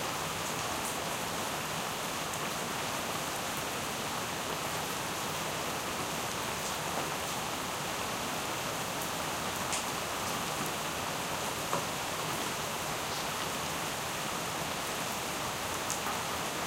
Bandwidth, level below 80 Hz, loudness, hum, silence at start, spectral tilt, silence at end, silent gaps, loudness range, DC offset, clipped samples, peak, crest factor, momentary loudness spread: 17 kHz; -60 dBFS; -34 LUFS; none; 0 s; -2 dB/octave; 0 s; none; 1 LU; under 0.1%; under 0.1%; -14 dBFS; 22 dB; 1 LU